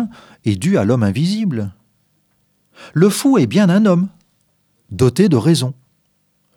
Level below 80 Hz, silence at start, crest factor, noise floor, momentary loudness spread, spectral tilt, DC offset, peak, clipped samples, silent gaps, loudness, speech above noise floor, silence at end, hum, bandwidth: -56 dBFS; 0 s; 16 dB; -63 dBFS; 13 LU; -6.5 dB/octave; under 0.1%; 0 dBFS; under 0.1%; none; -16 LUFS; 49 dB; 0.85 s; 50 Hz at -35 dBFS; 17 kHz